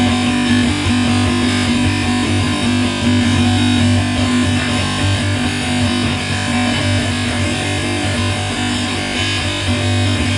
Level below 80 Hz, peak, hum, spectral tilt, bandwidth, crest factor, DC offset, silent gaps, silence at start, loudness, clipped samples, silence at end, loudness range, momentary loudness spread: -36 dBFS; -2 dBFS; none; -4.5 dB/octave; 11.5 kHz; 12 dB; under 0.1%; none; 0 s; -15 LUFS; under 0.1%; 0 s; 2 LU; 4 LU